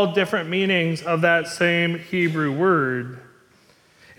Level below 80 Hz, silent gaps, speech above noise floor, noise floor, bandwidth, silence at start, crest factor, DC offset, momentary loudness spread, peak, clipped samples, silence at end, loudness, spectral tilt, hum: -64 dBFS; none; 35 dB; -56 dBFS; 14.5 kHz; 0 s; 16 dB; under 0.1%; 4 LU; -6 dBFS; under 0.1%; 0.95 s; -21 LUFS; -5.5 dB/octave; none